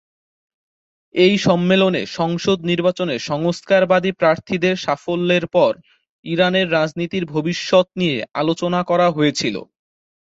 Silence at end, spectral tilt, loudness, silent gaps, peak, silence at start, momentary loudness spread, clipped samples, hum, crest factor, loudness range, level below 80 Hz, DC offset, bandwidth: 0.7 s; -5.5 dB/octave; -18 LUFS; 6.09-6.23 s; -2 dBFS; 1.15 s; 7 LU; under 0.1%; none; 16 dB; 2 LU; -58 dBFS; under 0.1%; 8 kHz